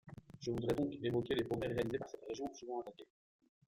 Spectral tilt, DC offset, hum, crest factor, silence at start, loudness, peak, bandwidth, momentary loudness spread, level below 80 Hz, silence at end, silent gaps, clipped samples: -6.5 dB/octave; under 0.1%; none; 20 dB; 0.05 s; -40 LUFS; -20 dBFS; 16.5 kHz; 10 LU; -64 dBFS; 0.65 s; none; under 0.1%